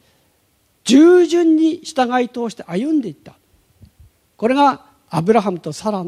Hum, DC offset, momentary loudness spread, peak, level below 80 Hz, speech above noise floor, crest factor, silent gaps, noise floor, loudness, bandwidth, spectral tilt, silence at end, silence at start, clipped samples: none; under 0.1%; 14 LU; 0 dBFS; -60 dBFS; 44 dB; 16 dB; none; -61 dBFS; -16 LUFS; 12.5 kHz; -5.5 dB/octave; 0 s; 0.85 s; under 0.1%